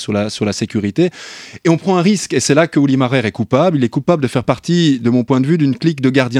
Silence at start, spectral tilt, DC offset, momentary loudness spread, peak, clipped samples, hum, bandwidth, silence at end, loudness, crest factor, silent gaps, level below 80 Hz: 0 s; -6 dB/octave; under 0.1%; 5 LU; 0 dBFS; under 0.1%; none; 13.5 kHz; 0 s; -15 LUFS; 14 dB; none; -54 dBFS